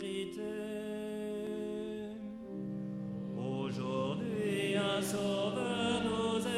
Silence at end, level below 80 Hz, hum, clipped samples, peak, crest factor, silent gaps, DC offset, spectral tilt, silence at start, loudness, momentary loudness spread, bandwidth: 0 s; -66 dBFS; none; under 0.1%; -20 dBFS; 16 dB; none; under 0.1%; -5 dB/octave; 0 s; -37 LUFS; 9 LU; 15.5 kHz